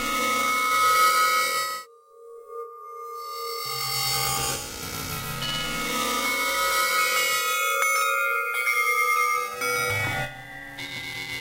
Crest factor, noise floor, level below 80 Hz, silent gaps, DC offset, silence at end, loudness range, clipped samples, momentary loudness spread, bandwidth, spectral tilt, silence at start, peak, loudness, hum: 20 dB; -48 dBFS; -52 dBFS; none; under 0.1%; 0 s; 6 LU; under 0.1%; 15 LU; 16 kHz; -1 dB/octave; 0 s; -6 dBFS; -23 LUFS; none